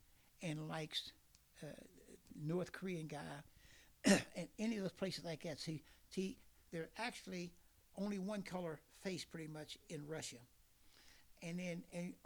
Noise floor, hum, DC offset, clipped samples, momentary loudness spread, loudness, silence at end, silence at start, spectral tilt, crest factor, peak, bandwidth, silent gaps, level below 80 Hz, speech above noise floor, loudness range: -68 dBFS; none; under 0.1%; under 0.1%; 16 LU; -45 LUFS; 0.1 s; 0.4 s; -4.5 dB/octave; 26 dB; -20 dBFS; over 20 kHz; none; -74 dBFS; 23 dB; 8 LU